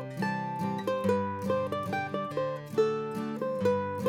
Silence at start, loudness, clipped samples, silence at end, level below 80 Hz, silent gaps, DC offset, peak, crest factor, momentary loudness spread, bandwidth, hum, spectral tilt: 0 s; -31 LUFS; under 0.1%; 0 s; -70 dBFS; none; under 0.1%; -16 dBFS; 16 dB; 5 LU; 16.5 kHz; none; -7 dB/octave